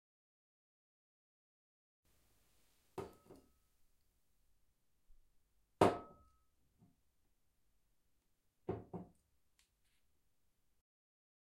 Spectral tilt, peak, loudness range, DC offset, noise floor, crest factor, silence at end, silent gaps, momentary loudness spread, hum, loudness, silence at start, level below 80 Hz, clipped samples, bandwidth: -6 dB/octave; -16 dBFS; 17 LU; under 0.1%; -83 dBFS; 34 dB; 2.4 s; none; 22 LU; none; -38 LUFS; 2.95 s; -74 dBFS; under 0.1%; 16 kHz